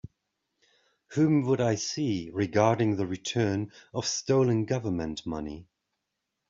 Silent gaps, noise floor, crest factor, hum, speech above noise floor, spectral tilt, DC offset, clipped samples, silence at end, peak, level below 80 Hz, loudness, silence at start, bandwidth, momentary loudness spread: none; -83 dBFS; 20 dB; none; 56 dB; -6 dB/octave; under 0.1%; under 0.1%; 0.85 s; -8 dBFS; -60 dBFS; -28 LUFS; 1.1 s; 7.8 kHz; 11 LU